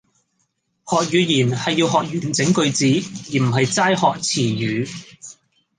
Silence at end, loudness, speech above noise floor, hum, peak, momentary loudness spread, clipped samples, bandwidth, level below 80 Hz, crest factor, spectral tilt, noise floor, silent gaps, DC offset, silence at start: 0.45 s; -19 LUFS; 51 dB; none; -4 dBFS; 10 LU; under 0.1%; 10 kHz; -60 dBFS; 16 dB; -4.5 dB/octave; -69 dBFS; none; under 0.1%; 0.85 s